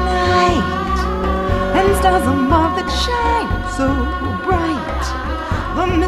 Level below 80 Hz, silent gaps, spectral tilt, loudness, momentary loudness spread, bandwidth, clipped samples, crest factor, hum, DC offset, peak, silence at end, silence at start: -24 dBFS; none; -5.5 dB/octave; -17 LUFS; 8 LU; 14 kHz; under 0.1%; 14 dB; none; under 0.1%; -2 dBFS; 0 s; 0 s